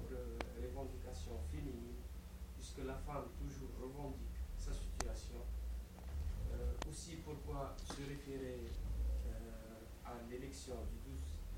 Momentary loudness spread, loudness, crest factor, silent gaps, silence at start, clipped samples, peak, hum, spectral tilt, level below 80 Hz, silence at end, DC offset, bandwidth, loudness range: 7 LU; -48 LUFS; 26 dB; none; 0 s; under 0.1%; -20 dBFS; none; -5.5 dB/octave; -48 dBFS; 0 s; under 0.1%; 16.5 kHz; 2 LU